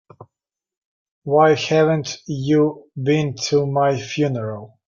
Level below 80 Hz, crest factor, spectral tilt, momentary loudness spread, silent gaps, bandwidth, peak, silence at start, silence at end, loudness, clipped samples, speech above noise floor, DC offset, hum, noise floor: -60 dBFS; 16 dB; -6 dB/octave; 11 LU; 0.77-1.22 s; 7.4 kHz; -2 dBFS; 0.2 s; 0.2 s; -19 LUFS; under 0.1%; 67 dB; under 0.1%; none; -86 dBFS